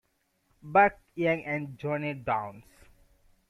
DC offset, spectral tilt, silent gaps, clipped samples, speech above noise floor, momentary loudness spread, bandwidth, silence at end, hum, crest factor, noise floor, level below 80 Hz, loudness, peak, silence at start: under 0.1%; -7.5 dB/octave; none; under 0.1%; 44 dB; 10 LU; 12.5 kHz; 0.9 s; none; 22 dB; -73 dBFS; -62 dBFS; -28 LUFS; -8 dBFS; 0.65 s